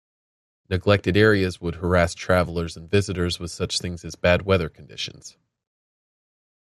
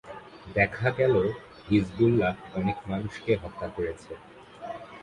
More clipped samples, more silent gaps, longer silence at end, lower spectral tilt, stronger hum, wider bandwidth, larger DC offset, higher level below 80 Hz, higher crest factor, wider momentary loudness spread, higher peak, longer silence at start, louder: neither; neither; first, 1.45 s vs 0 s; second, -5.5 dB/octave vs -8 dB/octave; neither; first, 13 kHz vs 11 kHz; neither; about the same, -48 dBFS vs -50 dBFS; about the same, 22 dB vs 20 dB; second, 14 LU vs 19 LU; first, -2 dBFS vs -8 dBFS; first, 0.7 s vs 0.05 s; first, -23 LUFS vs -27 LUFS